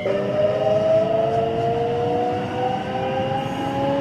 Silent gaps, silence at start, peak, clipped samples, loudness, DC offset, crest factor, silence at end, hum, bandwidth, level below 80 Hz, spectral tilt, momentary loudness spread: none; 0 s; -8 dBFS; under 0.1%; -21 LUFS; under 0.1%; 12 dB; 0 s; none; 10.5 kHz; -50 dBFS; -7 dB/octave; 6 LU